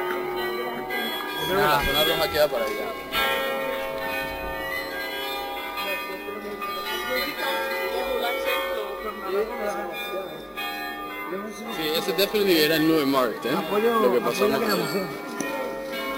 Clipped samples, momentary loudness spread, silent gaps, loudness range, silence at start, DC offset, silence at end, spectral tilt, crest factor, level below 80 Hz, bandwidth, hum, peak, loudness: under 0.1%; 11 LU; none; 7 LU; 0 s; under 0.1%; 0 s; -3.5 dB/octave; 18 dB; -50 dBFS; 16 kHz; none; -8 dBFS; -25 LUFS